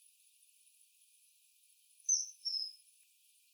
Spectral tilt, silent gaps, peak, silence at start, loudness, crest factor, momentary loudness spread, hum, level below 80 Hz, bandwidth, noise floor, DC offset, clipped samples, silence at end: 10 dB/octave; none; -20 dBFS; 2.05 s; -36 LUFS; 24 dB; 11 LU; none; under -90 dBFS; over 20 kHz; -70 dBFS; under 0.1%; under 0.1%; 0.75 s